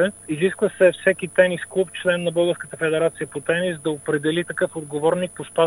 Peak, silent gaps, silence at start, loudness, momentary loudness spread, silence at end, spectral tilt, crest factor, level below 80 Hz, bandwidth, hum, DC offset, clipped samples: -2 dBFS; none; 0 s; -22 LUFS; 7 LU; 0 s; -5 dB/octave; 18 dB; -62 dBFS; 12 kHz; none; under 0.1%; under 0.1%